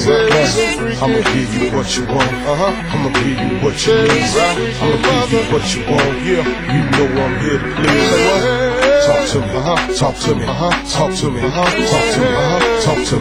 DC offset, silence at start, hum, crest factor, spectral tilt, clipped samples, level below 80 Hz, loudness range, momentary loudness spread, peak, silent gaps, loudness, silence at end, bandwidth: under 0.1%; 0 s; none; 14 dB; -4.5 dB/octave; under 0.1%; -32 dBFS; 2 LU; 5 LU; 0 dBFS; none; -14 LUFS; 0 s; 16 kHz